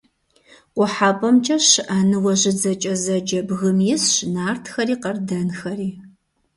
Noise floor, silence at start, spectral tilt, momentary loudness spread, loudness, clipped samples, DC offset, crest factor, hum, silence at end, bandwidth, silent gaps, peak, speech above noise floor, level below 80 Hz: -57 dBFS; 0.75 s; -3.5 dB/octave; 11 LU; -19 LUFS; under 0.1%; under 0.1%; 18 dB; none; 0.5 s; 11.5 kHz; none; -2 dBFS; 38 dB; -60 dBFS